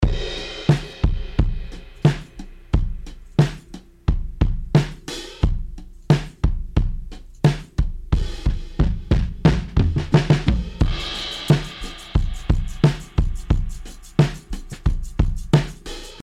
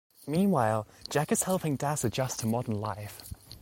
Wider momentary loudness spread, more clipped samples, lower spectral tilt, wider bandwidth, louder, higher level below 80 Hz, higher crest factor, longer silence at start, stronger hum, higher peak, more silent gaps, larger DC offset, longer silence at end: about the same, 15 LU vs 13 LU; neither; first, -7 dB/octave vs -5 dB/octave; second, 12 kHz vs 17 kHz; first, -23 LUFS vs -30 LUFS; first, -26 dBFS vs -58 dBFS; about the same, 20 dB vs 18 dB; second, 0 s vs 0.2 s; neither; first, 0 dBFS vs -12 dBFS; neither; neither; about the same, 0 s vs 0.05 s